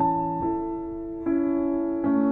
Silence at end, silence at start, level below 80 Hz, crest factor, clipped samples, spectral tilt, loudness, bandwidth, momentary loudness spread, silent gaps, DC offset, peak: 0 s; 0 s; -50 dBFS; 12 dB; under 0.1%; -12 dB/octave; -26 LUFS; 2.8 kHz; 7 LU; none; under 0.1%; -12 dBFS